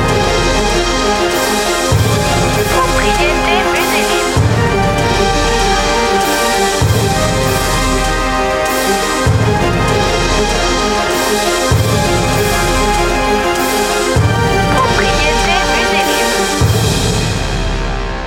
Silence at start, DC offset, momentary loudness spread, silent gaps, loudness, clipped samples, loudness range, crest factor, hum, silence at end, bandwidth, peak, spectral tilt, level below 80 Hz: 0 s; under 0.1%; 2 LU; none; -13 LUFS; under 0.1%; 1 LU; 12 dB; none; 0 s; 16.5 kHz; 0 dBFS; -4 dB/octave; -22 dBFS